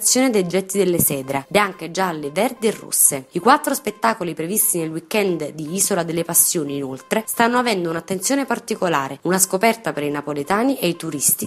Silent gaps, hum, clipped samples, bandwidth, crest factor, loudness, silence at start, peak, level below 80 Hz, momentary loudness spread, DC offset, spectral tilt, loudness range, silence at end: none; none; under 0.1%; 16 kHz; 20 dB; -19 LUFS; 0 s; 0 dBFS; -60 dBFS; 9 LU; under 0.1%; -3 dB/octave; 2 LU; 0 s